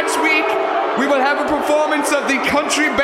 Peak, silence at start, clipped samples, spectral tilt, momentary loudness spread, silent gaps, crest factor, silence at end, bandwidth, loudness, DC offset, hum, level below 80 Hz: -2 dBFS; 0 s; under 0.1%; -2.5 dB/octave; 3 LU; none; 14 dB; 0 s; 16 kHz; -16 LUFS; under 0.1%; none; -50 dBFS